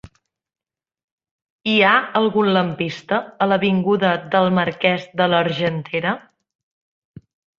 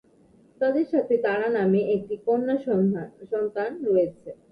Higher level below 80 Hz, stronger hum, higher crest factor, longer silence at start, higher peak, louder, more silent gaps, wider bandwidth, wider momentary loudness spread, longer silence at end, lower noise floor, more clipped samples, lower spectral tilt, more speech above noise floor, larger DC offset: first, -60 dBFS vs -66 dBFS; neither; first, 20 dB vs 14 dB; first, 1.65 s vs 0.6 s; first, -2 dBFS vs -10 dBFS; first, -18 LUFS vs -25 LUFS; neither; first, 7 kHz vs 5.2 kHz; about the same, 8 LU vs 7 LU; first, 1.4 s vs 0.2 s; second, -47 dBFS vs -57 dBFS; neither; second, -7 dB/octave vs -9.5 dB/octave; second, 28 dB vs 33 dB; neither